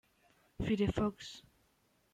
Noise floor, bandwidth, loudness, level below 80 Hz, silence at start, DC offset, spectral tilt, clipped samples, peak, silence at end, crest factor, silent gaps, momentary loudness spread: -74 dBFS; 11 kHz; -35 LUFS; -54 dBFS; 0.6 s; under 0.1%; -6.5 dB/octave; under 0.1%; -20 dBFS; 0.75 s; 20 dB; none; 16 LU